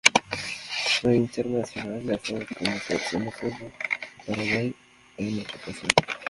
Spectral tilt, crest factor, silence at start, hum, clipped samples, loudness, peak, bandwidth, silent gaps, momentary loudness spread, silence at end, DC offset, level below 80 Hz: -3.5 dB/octave; 28 dB; 0.05 s; none; under 0.1%; -27 LUFS; 0 dBFS; 11.5 kHz; none; 11 LU; 0 s; under 0.1%; -56 dBFS